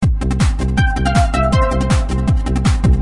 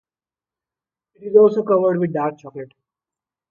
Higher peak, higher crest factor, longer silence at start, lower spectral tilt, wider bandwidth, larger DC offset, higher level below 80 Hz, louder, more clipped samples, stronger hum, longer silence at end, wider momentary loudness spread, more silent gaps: about the same, -2 dBFS vs -2 dBFS; second, 12 dB vs 20 dB; second, 0 s vs 1.2 s; second, -6.5 dB/octave vs -10 dB/octave; first, 11.5 kHz vs 4.3 kHz; neither; first, -18 dBFS vs -70 dBFS; about the same, -16 LUFS vs -17 LUFS; neither; neither; second, 0 s vs 0.85 s; second, 2 LU vs 22 LU; neither